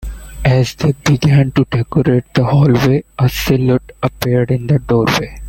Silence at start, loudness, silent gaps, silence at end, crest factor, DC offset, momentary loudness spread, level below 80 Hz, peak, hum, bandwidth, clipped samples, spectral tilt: 0 s; -14 LUFS; none; 0 s; 12 dB; under 0.1%; 5 LU; -32 dBFS; 0 dBFS; none; 17 kHz; under 0.1%; -7 dB/octave